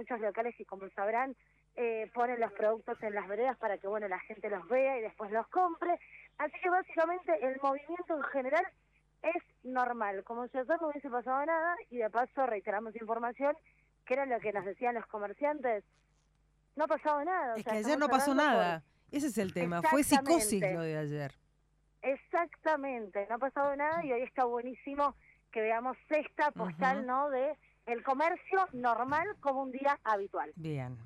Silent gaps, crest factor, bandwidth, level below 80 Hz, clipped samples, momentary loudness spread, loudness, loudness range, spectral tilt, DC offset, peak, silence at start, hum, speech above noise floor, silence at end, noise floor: none; 20 dB; 13.5 kHz; -70 dBFS; under 0.1%; 9 LU; -34 LUFS; 5 LU; -4.5 dB/octave; under 0.1%; -14 dBFS; 0 s; none; 38 dB; 0 s; -72 dBFS